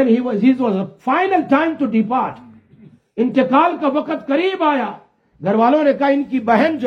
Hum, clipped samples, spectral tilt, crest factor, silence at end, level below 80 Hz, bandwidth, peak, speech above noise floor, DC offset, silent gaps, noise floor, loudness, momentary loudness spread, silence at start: none; under 0.1%; -8 dB/octave; 16 dB; 0 s; -64 dBFS; 6.4 kHz; -2 dBFS; 31 dB; under 0.1%; none; -47 dBFS; -17 LUFS; 7 LU; 0 s